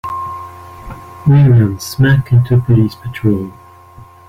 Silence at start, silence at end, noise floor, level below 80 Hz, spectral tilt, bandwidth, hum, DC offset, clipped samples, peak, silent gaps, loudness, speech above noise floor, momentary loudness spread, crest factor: 0.05 s; 0.25 s; -39 dBFS; -38 dBFS; -7.5 dB/octave; 15.5 kHz; none; under 0.1%; under 0.1%; -2 dBFS; none; -13 LUFS; 28 dB; 22 LU; 12 dB